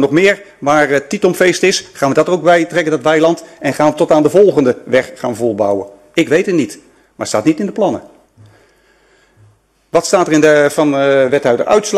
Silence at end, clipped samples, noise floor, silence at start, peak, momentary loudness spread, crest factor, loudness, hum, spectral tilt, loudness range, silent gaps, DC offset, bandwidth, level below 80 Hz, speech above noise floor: 0 s; under 0.1%; -51 dBFS; 0 s; 0 dBFS; 8 LU; 12 dB; -13 LUFS; none; -4.5 dB/octave; 6 LU; none; under 0.1%; 13 kHz; -54 dBFS; 39 dB